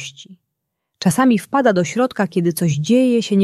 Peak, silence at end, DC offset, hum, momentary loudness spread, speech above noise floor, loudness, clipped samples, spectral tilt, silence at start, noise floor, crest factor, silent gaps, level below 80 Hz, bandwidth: -2 dBFS; 0 s; under 0.1%; none; 5 LU; 60 dB; -17 LUFS; under 0.1%; -6 dB/octave; 0 s; -77 dBFS; 14 dB; none; -62 dBFS; 14 kHz